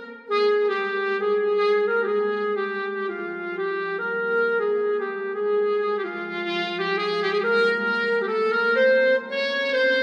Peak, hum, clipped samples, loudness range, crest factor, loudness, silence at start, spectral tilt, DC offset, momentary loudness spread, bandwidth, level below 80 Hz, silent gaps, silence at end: -10 dBFS; none; under 0.1%; 3 LU; 14 dB; -23 LUFS; 0 s; -5 dB/octave; under 0.1%; 7 LU; 7.2 kHz; -90 dBFS; none; 0 s